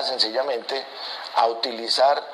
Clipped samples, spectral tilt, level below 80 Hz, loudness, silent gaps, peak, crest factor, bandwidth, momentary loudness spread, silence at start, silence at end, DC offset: under 0.1%; -1 dB/octave; -84 dBFS; -23 LUFS; none; -6 dBFS; 18 dB; 13.5 kHz; 10 LU; 0 s; 0 s; under 0.1%